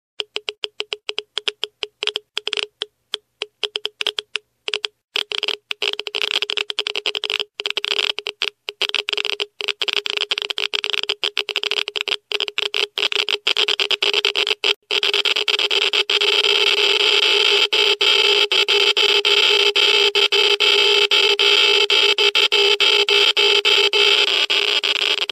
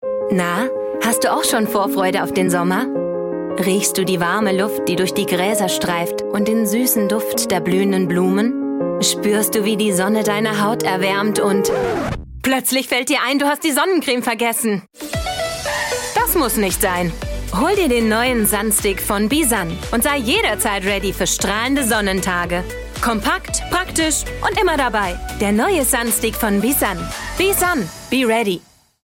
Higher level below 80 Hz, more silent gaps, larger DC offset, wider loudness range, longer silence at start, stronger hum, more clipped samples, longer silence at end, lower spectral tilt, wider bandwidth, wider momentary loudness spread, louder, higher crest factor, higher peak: second, -74 dBFS vs -36 dBFS; first, 0.58-0.62 s, 5.04-5.08 s, 14.76-14.82 s vs none; neither; first, 12 LU vs 2 LU; first, 0.2 s vs 0 s; neither; neither; second, 0.05 s vs 0.5 s; second, 1.5 dB/octave vs -3.5 dB/octave; second, 14.5 kHz vs 17 kHz; first, 12 LU vs 6 LU; about the same, -16 LUFS vs -18 LUFS; about the same, 18 dB vs 14 dB; first, 0 dBFS vs -4 dBFS